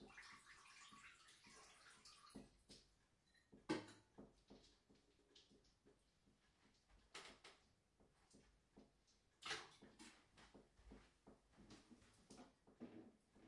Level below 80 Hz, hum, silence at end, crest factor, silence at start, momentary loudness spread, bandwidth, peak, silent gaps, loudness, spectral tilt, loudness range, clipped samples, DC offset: -80 dBFS; none; 0 s; 30 dB; 0 s; 17 LU; 12 kHz; -32 dBFS; none; -60 LUFS; -3 dB/octave; 9 LU; under 0.1%; under 0.1%